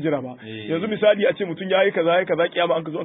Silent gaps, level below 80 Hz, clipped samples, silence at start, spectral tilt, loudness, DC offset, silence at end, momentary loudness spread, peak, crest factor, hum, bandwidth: none; -68 dBFS; under 0.1%; 0 s; -10.5 dB/octave; -21 LUFS; under 0.1%; 0 s; 10 LU; -6 dBFS; 16 dB; none; 4 kHz